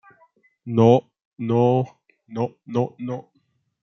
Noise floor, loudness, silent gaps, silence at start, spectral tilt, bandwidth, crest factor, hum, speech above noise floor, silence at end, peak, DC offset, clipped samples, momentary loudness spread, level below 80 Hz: -68 dBFS; -22 LUFS; 1.25-1.32 s; 0.65 s; -9 dB/octave; 6.6 kHz; 20 dB; none; 48 dB; 0.65 s; -2 dBFS; under 0.1%; under 0.1%; 17 LU; -66 dBFS